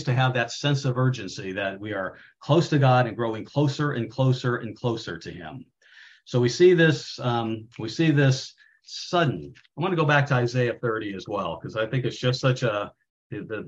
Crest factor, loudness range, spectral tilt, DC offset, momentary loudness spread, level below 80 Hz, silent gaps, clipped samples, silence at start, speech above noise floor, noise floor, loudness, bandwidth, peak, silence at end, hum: 18 dB; 3 LU; -6.5 dB/octave; under 0.1%; 16 LU; -62 dBFS; 13.10-13.30 s; under 0.1%; 0 s; 28 dB; -52 dBFS; -24 LUFS; 7.8 kHz; -6 dBFS; 0 s; none